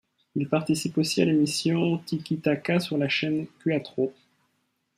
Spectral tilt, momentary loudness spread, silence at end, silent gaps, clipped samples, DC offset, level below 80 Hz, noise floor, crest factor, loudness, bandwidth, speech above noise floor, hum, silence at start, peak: -5.5 dB/octave; 8 LU; 0.85 s; none; under 0.1%; under 0.1%; -68 dBFS; -74 dBFS; 18 dB; -26 LUFS; 15.5 kHz; 48 dB; none; 0.35 s; -8 dBFS